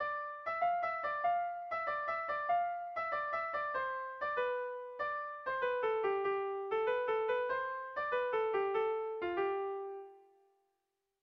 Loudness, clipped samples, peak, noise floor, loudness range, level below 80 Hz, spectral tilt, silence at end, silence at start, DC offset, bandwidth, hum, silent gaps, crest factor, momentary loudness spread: -36 LUFS; under 0.1%; -24 dBFS; -86 dBFS; 2 LU; -74 dBFS; -1 dB/octave; 1.05 s; 0 s; under 0.1%; 6 kHz; none; none; 14 dB; 6 LU